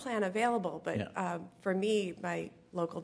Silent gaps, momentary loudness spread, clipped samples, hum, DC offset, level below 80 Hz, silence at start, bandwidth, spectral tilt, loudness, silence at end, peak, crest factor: none; 7 LU; under 0.1%; none; under 0.1%; -74 dBFS; 0 s; 11 kHz; -5.5 dB/octave; -35 LUFS; 0 s; -18 dBFS; 16 dB